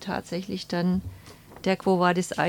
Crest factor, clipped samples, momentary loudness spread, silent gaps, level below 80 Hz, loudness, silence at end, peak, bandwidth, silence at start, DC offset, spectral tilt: 18 dB; under 0.1%; 10 LU; none; -52 dBFS; -26 LUFS; 0 s; -8 dBFS; 17 kHz; 0 s; under 0.1%; -6 dB/octave